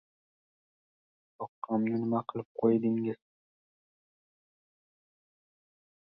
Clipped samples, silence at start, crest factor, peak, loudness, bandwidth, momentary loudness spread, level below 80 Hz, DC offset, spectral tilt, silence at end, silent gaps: under 0.1%; 1.4 s; 22 dB; -14 dBFS; -31 LUFS; 4.9 kHz; 17 LU; -78 dBFS; under 0.1%; -11.5 dB/octave; 2.95 s; 1.49-1.62 s, 2.45-2.55 s